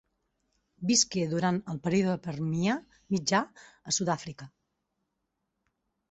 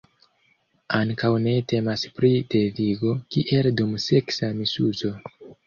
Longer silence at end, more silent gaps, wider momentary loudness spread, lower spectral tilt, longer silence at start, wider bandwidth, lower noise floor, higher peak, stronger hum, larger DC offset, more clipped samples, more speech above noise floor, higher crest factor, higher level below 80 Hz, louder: first, 1.65 s vs 0.15 s; neither; first, 13 LU vs 6 LU; second, -4 dB/octave vs -6.5 dB/octave; about the same, 0.8 s vs 0.9 s; first, 8.4 kHz vs 7.4 kHz; first, -82 dBFS vs -65 dBFS; second, -10 dBFS vs -6 dBFS; neither; neither; neither; first, 53 dB vs 43 dB; about the same, 22 dB vs 18 dB; second, -66 dBFS vs -56 dBFS; second, -29 LUFS vs -23 LUFS